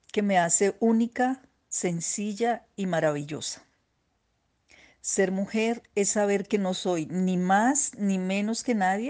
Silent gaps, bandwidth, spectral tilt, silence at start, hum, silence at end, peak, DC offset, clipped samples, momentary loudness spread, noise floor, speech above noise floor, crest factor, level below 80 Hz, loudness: none; 10 kHz; -4.5 dB/octave; 0.15 s; none; 0 s; -10 dBFS; under 0.1%; under 0.1%; 9 LU; -73 dBFS; 47 dB; 16 dB; -70 dBFS; -26 LUFS